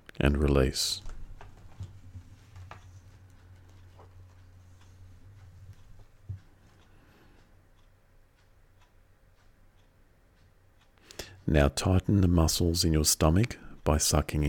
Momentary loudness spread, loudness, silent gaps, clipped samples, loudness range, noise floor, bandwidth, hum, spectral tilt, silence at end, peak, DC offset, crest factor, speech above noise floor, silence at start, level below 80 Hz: 26 LU; -26 LUFS; none; under 0.1%; 27 LU; -61 dBFS; 19 kHz; none; -4.5 dB/octave; 0 s; -8 dBFS; under 0.1%; 22 dB; 36 dB; 0.2 s; -38 dBFS